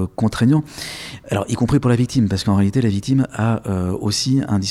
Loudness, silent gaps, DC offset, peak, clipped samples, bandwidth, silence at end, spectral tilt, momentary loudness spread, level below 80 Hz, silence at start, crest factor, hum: -19 LUFS; none; under 0.1%; -4 dBFS; under 0.1%; 14.5 kHz; 0 s; -6 dB/octave; 8 LU; -42 dBFS; 0 s; 14 dB; none